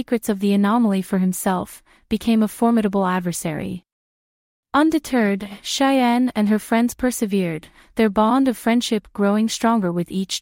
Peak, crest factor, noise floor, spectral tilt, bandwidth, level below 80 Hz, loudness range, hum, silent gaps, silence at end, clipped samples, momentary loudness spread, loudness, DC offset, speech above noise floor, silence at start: -4 dBFS; 14 dB; under -90 dBFS; -5.5 dB/octave; 16.5 kHz; -52 dBFS; 3 LU; none; 3.92-4.63 s; 0 s; under 0.1%; 9 LU; -20 LUFS; under 0.1%; over 71 dB; 0 s